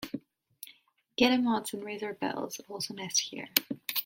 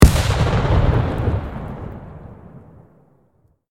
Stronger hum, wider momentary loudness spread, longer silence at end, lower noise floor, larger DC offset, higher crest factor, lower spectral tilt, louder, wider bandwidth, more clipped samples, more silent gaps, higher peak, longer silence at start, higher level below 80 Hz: neither; about the same, 20 LU vs 22 LU; second, 0 s vs 1.1 s; about the same, -62 dBFS vs -60 dBFS; neither; first, 32 dB vs 18 dB; second, -2 dB/octave vs -6 dB/octave; second, -31 LUFS vs -19 LUFS; about the same, 17 kHz vs 16.5 kHz; neither; neither; about the same, -2 dBFS vs 0 dBFS; about the same, 0 s vs 0 s; second, -74 dBFS vs -22 dBFS